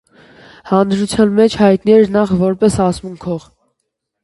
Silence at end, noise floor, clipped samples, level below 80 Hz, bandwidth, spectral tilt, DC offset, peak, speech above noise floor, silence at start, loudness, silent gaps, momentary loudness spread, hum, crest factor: 0.85 s; -73 dBFS; under 0.1%; -42 dBFS; 11.5 kHz; -6.5 dB/octave; under 0.1%; 0 dBFS; 61 dB; 0.65 s; -13 LUFS; none; 13 LU; none; 14 dB